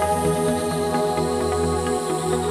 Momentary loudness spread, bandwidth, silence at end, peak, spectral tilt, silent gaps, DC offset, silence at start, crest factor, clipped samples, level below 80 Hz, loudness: 2 LU; 14 kHz; 0 s; -8 dBFS; -5 dB/octave; none; under 0.1%; 0 s; 14 dB; under 0.1%; -40 dBFS; -22 LUFS